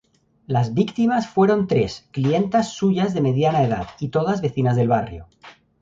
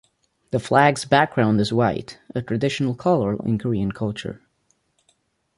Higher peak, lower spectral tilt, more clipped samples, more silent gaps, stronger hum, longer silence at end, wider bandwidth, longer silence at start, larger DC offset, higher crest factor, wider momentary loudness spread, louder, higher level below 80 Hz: about the same, -4 dBFS vs -2 dBFS; first, -7.5 dB/octave vs -6 dB/octave; neither; neither; neither; second, 0.3 s vs 1.2 s; second, 7.8 kHz vs 11.5 kHz; about the same, 0.5 s vs 0.55 s; neither; about the same, 16 dB vs 20 dB; second, 7 LU vs 14 LU; about the same, -20 LUFS vs -21 LUFS; about the same, -50 dBFS vs -52 dBFS